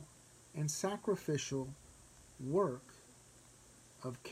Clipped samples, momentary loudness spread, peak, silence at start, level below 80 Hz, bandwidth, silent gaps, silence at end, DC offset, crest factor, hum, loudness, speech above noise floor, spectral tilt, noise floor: under 0.1%; 24 LU; -22 dBFS; 0 s; -70 dBFS; 16 kHz; none; 0 s; under 0.1%; 20 dB; none; -39 LUFS; 24 dB; -5 dB/octave; -62 dBFS